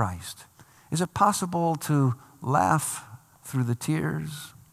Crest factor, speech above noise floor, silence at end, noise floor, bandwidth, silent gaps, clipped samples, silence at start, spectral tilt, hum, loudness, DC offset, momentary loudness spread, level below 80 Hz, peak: 20 dB; 28 dB; 0.25 s; -54 dBFS; 15 kHz; none; under 0.1%; 0 s; -5.5 dB/octave; none; -27 LUFS; under 0.1%; 15 LU; -62 dBFS; -6 dBFS